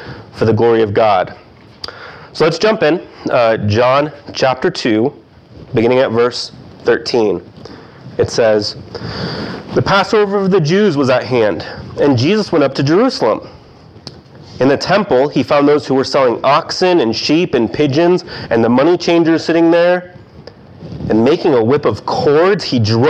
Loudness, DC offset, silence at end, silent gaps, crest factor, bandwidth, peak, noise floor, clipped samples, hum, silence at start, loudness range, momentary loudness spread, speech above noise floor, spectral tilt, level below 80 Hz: -13 LUFS; under 0.1%; 0 s; none; 12 dB; 9.2 kHz; -2 dBFS; -39 dBFS; under 0.1%; none; 0 s; 4 LU; 12 LU; 27 dB; -6 dB/octave; -46 dBFS